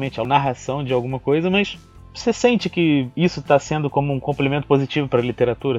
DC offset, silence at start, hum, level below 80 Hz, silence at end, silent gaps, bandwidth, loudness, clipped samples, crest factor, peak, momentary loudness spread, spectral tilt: under 0.1%; 0 s; none; -48 dBFS; 0 s; none; 8 kHz; -20 LUFS; under 0.1%; 18 dB; -2 dBFS; 6 LU; -6.5 dB/octave